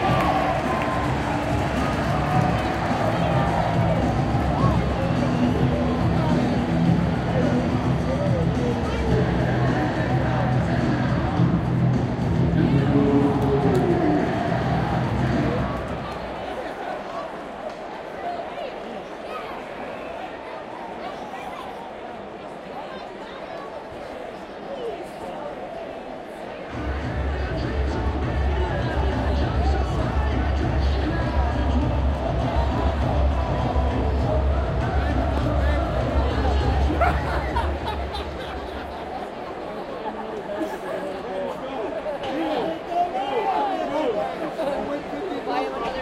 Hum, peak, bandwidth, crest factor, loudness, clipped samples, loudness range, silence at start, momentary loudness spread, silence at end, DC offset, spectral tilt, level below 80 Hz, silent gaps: none; -6 dBFS; 11.5 kHz; 16 dB; -24 LUFS; under 0.1%; 13 LU; 0 s; 13 LU; 0 s; under 0.1%; -7.5 dB/octave; -30 dBFS; none